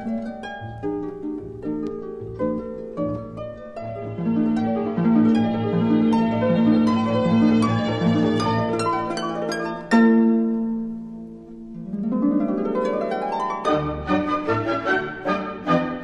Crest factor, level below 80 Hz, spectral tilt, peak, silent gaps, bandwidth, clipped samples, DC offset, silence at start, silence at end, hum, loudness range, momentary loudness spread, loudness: 16 dB; -50 dBFS; -7.5 dB/octave; -4 dBFS; none; 9.8 kHz; under 0.1%; under 0.1%; 0 s; 0 s; none; 10 LU; 15 LU; -22 LUFS